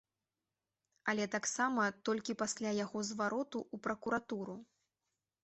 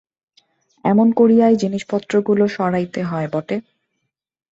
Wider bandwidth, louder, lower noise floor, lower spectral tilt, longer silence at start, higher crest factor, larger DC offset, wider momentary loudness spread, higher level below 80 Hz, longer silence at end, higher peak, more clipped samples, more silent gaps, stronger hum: about the same, 8.2 kHz vs 7.8 kHz; second, -38 LUFS vs -17 LUFS; first, under -90 dBFS vs -76 dBFS; second, -3.5 dB/octave vs -7.5 dB/octave; first, 1.05 s vs 0.85 s; about the same, 20 dB vs 16 dB; neither; second, 8 LU vs 11 LU; second, -78 dBFS vs -60 dBFS; about the same, 0.8 s vs 0.9 s; second, -20 dBFS vs -4 dBFS; neither; neither; neither